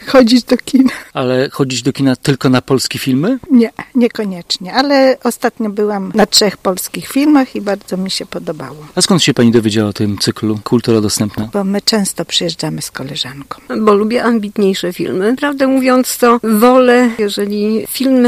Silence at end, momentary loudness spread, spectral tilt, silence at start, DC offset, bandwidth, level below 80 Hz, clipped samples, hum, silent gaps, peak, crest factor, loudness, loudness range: 0 s; 10 LU; -4.5 dB/octave; 0 s; under 0.1%; 15.5 kHz; -48 dBFS; under 0.1%; none; none; 0 dBFS; 12 dB; -13 LUFS; 4 LU